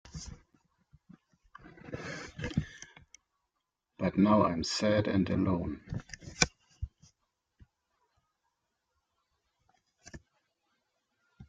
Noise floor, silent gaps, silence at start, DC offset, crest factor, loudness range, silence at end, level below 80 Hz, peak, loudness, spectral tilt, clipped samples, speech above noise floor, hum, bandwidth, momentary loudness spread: -85 dBFS; none; 0.05 s; under 0.1%; 32 dB; 13 LU; 0.05 s; -54 dBFS; -4 dBFS; -31 LUFS; -5 dB/octave; under 0.1%; 56 dB; none; 9.4 kHz; 24 LU